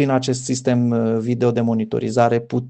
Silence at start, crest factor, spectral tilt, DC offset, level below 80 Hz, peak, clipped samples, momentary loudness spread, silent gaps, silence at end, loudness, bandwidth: 0 s; 18 dB; -6.5 dB/octave; under 0.1%; -60 dBFS; -2 dBFS; under 0.1%; 3 LU; none; 0 s; -19 LUFS; 9 kHz